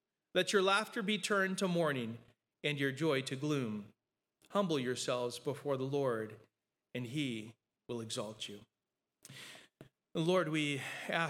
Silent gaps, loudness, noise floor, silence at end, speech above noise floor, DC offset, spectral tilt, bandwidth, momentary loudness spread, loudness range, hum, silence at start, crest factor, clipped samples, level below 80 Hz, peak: none; -36 LUFS; under -90 dBFS; 0 s; over 54 dB; under 0.1%; -4.5 dB/octave; 16.5 kHz; 15 LU; 10 LU; none; 0.35 s; 20 dB; under 0.1%; -86 dBFS; -18 dBFS